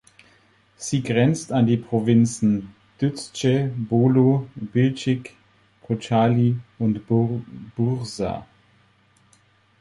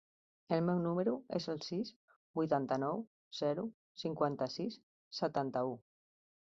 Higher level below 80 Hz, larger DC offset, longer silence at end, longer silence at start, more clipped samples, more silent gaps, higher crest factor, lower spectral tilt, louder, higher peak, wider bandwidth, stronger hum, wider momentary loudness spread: first, -54 dBFS vs -78 dBFS; neither; first, 1.4 s vs 0.7 s; first, 0.8 s vs 0.5 s; neither; second, none vs 1.96-2.08 s, 2.16-2.34 s, 3.07-3.31 s, 3.74-3.95 s, 4.83-5.11 s; about the same, 18 dB vs 20 dB; about the same, -7 dB/octave vs -6 dB/octave; first, -22 LUFS vs -38 LUFS; first, -6 dBFS vs -18 dBFS; first, 11.5 kHz vs 7.6 kHz; neither; about the same, 10 LU vs 11 LU